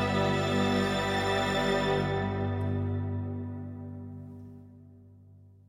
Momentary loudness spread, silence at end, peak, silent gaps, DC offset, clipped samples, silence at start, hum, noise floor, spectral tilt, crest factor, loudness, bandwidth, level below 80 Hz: 17 LU; 0.2 s; -14 dBFS; none; under 0.1%; under 0.1%; 0 s; 50 Hz at -60 dBFS; -54 dBFS; -6 dB/octave; 16 dB; -29 LUFS; 15 kHz; -52 dBFS